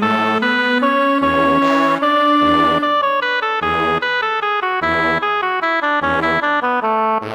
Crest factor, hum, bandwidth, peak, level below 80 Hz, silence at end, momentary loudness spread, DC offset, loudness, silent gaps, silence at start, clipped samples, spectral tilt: 12 dB; none; 19.5 kHz; -2 dBFS; -46 dBFS; 0 s; 4 LU; under 0.1%; -15 LUFS; none; 0 s; under 0.1%; -5 dB/octave